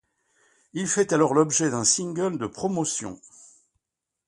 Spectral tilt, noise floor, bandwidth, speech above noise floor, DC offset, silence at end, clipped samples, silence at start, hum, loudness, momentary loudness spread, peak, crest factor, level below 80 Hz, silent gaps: -3.5 dB/octave; -85 dBFS; 11.5 kHz; 61 dB; under 0.1%; 1.15 s; under 0.1%; 0.75 s; none; -23 LUFS; 13 LU; -6 dBFS; 20 dB; -64 dBFS; none